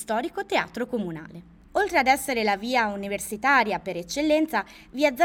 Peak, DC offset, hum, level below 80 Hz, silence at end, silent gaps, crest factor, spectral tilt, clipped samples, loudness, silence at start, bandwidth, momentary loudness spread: -8 dBFS; under 0.1%; none; -56 dBFS; 0 s; none; 18 dB; -3.5 dB/octave; under 0.1%; -25 LUFS; 0 s; 19 kHz; 10 LU